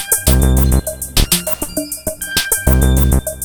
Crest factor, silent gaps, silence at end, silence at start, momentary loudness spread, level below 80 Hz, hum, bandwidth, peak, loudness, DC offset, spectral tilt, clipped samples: 14 dB; none; 0 s; 0 s; 8 LU; -18 dBFS; none; over 20 kHz; 0 dBFS; -14 LUFS; under 0.1%; -4 dB/octave; under 0.1%